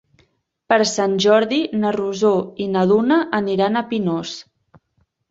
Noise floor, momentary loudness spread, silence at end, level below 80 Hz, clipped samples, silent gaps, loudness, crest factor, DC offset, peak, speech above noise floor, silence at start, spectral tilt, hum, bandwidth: -66 dBFS; 8 LU; 0.9 s; -62 dBFS; under 0.1%; none; -18 LUFS; 18 dB; under 0.1%; -2 dBFS; 49 dB; 0.7 s; -5 dB/octave; none; 8 kHz